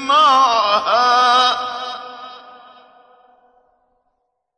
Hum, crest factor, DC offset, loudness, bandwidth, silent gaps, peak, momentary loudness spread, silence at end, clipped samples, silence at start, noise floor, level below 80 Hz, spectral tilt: none; 16 dB; under 0.1%; -14 LUFS; 9.2 kHz; none; -2 dBFS; 21 LU; 2.2 s; under 0.1%; 0 s; -70 dBFS; -64 dBFS; -0.5 dB/octave